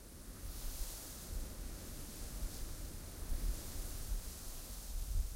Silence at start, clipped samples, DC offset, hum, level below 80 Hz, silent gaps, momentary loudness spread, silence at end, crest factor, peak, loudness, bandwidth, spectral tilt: 0 s; under 0.1%; under 0.1%; none; -44 dBFS; none; 5 LU; 0 s; 18 dB; -26 dBFS; -47 LUFS; 16 kHz; -3.5 dB/octave